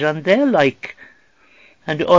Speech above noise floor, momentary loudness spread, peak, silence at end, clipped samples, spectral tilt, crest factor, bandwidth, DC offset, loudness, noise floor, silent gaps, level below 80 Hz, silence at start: 38 dB; 19 LU; 0 dBFS; 0 s; under 0.1%; -6.5 dB/octave; 18 dB; 7.6 kHz; 0.2%; -17 LUFS; -53 dBFS; none; -58 dBFS; 0 s